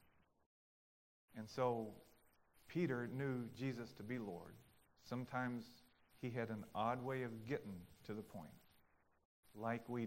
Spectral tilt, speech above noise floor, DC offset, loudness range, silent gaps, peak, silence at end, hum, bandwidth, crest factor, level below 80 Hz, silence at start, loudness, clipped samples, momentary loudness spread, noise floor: -7 dB/octave; 30 dB; under 0.1%; 3 LU; 9.25-9.43 s; -26 dBFS; 0 s; none; 16 kHz; 20 dB; -78 dBFS; 1.3 s; -46 LUFS; under 0.1%; 15 LU; -75 dBFS